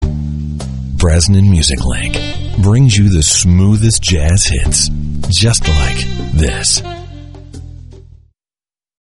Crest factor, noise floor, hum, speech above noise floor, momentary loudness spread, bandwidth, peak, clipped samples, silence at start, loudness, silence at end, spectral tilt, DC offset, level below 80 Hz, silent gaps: 12 dB; under -90 dBFS; none; over 80 dB; 16 LU; 11.5 kHz; 0 dBFS; under 0.1%; 0 s; -12 LUFS; 1 s; -4 dB/octave; under 0.1%; -20 dBFS; none